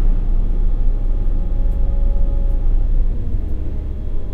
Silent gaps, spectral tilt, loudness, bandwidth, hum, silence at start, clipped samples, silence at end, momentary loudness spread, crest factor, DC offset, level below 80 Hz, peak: none; -10 dB/octave; -23 LUFS; 1.4 kHz; none; 0 s; under 0.1%; 0 s; 5 LU; 10 dB; under 0.1%; -16 dBFS; -4 dBFS